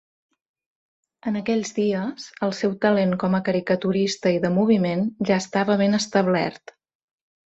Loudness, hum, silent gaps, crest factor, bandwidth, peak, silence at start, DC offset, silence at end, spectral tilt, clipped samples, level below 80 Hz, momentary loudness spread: -22 LUFS; none; none; 18 dB; 8.2 kHz; -6 dBFS; 1.25 s; under 0.1%; 0.95 s; -6 dB/octave; under 0.1%; -62 dBFS; 8 LU